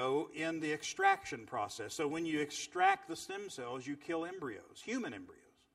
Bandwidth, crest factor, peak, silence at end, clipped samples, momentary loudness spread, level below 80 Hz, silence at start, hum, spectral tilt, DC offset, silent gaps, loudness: 14.5 kHz; 22 dB; -16 dBFS; 0.4 s; under 0.1%; 13 LU; -76 dBFS; 0 s; none; -3.5 dB/octave; under 0.1%; none; -37 LUFS